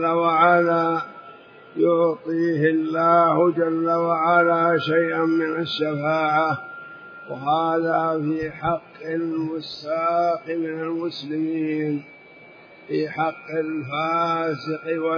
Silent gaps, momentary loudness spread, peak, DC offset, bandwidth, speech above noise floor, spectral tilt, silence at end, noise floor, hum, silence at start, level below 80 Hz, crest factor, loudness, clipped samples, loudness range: none; 12 LU; -4 dBFS; under 0.1%; 5.4 kHz; 25 dB; -8 dB/octave; 0 s; -47 dBFS; none; 0 s; -64 dBFS; 18 dB; -22 LUFS; under 0.1%; 7 LU